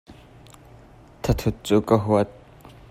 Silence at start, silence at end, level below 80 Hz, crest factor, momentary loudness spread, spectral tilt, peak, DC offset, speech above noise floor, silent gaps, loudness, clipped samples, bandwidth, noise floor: 0.1 s; 0.6 s; -40 dBFS; 20 dB; 9 LU; -7 dB/octave; -4 dBFS; under 0.1%; 28 dB; none; -22 LUFS; under 0.1%; 16 kHz; -48 dBFS